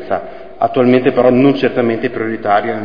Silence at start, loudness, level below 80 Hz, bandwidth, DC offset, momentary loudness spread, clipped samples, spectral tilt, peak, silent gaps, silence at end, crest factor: 0 s; -13 LUFS; -50 dBFS; 5.2 kHz; 2%; 10 LU; under 0.1%; -9 dB/octave; 0 dBFS; none; 0 s; 14 dB